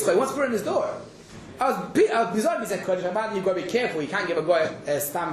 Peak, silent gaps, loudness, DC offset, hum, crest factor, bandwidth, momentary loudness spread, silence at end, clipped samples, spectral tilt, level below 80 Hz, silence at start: -8 dBFS; none; -25 LUFS; under 0.1%; none; 16 dB; 14 kHz; 6 LU; 0 s; under 0.1%; -4.5 dB/octave; -62 dBFS; 0 s